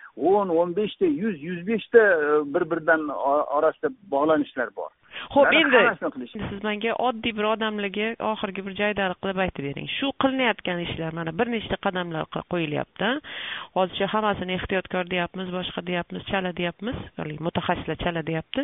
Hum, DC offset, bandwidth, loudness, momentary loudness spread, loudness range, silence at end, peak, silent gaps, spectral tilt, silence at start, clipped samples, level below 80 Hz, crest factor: none; under 0.1%; 4 kHz; -25 LUFS; 12 LU; 6 LU; 0 s; -4 dBFS; none; -3 dB/octave; 0 s; under 0.1%; -52 dBFS; 22 dB